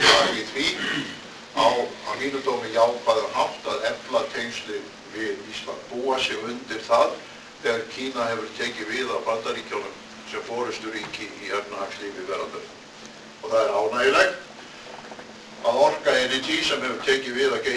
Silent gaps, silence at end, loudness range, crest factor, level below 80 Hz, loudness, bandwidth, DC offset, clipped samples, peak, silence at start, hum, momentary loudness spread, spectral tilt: none; 0 s; 7 LU; 22 dB; -60 dBFS; -25 LUFS; 11 kHz; under 0.1%; under 0.1%; -2 dBFS; 0 s; none; 18 LU; -2.5 dB/octave